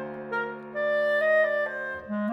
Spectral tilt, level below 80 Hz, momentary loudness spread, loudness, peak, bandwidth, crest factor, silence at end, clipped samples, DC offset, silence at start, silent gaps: -6.5 dB/octave; -68 dBFS; 10 LU; -26 LUFS; -12 dBFS; 6 kHz; 14 dB; 0 s; under 0.1%; under 0.1%; 0 s; none